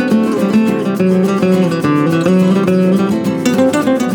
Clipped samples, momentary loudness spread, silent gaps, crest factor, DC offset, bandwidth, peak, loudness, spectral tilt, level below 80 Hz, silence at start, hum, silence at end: under 0.1%; 3 LU; none; 12 dB; under 0.1%; 18 kHz; 0 dBFS; -13 LUFS; -7 dB/octave; -56 dBFS; 0 s; none; 0 s